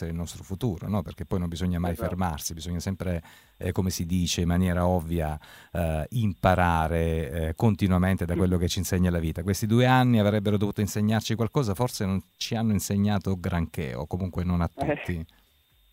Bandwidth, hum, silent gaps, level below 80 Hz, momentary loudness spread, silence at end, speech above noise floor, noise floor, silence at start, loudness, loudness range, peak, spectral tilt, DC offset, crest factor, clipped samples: 16 kHz; none; none; -42 dBFS; 10 LU; 0.7 s; 37 dB; -63 dBFS; 0 s; -27 LUFS; 5 LU; -6 dBFS; -6 dB/octave; under 0.1%; 20 dB; under 0.1%